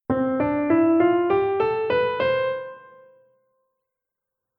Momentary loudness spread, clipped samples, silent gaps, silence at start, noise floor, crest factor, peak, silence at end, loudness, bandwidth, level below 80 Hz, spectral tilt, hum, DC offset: 7 LU; under 0.1%; none; 0.1 s; -85 dBFS; 16 dB; -6 dBFS; 1.8 s; -21 LUFS; 5.2 kHz; -56 dBFS; -9.5 dB/octave; none; under 0.1%